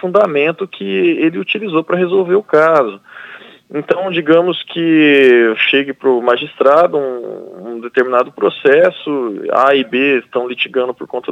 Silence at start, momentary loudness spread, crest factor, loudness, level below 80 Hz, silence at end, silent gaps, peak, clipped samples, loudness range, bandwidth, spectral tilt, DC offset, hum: 0.05 s; 14 LU; 14 dB; -13 LUFS; -68 dBFS; 0 s; none; 0 dBFS; under 0.1%; 3 LU; 7.8 kHz; -6.5 dB/octave; under 0.1%; none